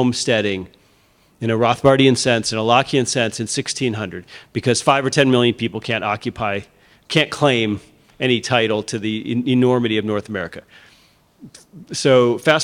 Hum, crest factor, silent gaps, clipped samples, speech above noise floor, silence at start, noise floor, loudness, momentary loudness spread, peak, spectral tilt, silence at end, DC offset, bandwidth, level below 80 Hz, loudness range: none; 18 dB; none; under 0.1%; 38 dB; 0 s; -56 dBFS; -18 LUFS; 13 LU; 0 dBFS; -4.5 dB/octave; 0 s; under 0.1%; 14.5 kHz; -56 dBFS; 3 LU